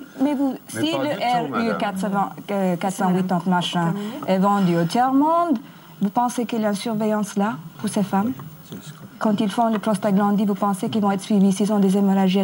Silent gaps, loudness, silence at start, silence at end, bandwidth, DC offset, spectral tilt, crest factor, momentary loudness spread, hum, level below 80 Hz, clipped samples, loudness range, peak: none; -21 LUFS; 0 s; 0 s; 16.5 kHz; under 0.1%; -6.5 dB/octave; 12 dB; 8 LU; none; -68 dBFS; under 0.1%; 4 LU; -8 dBFS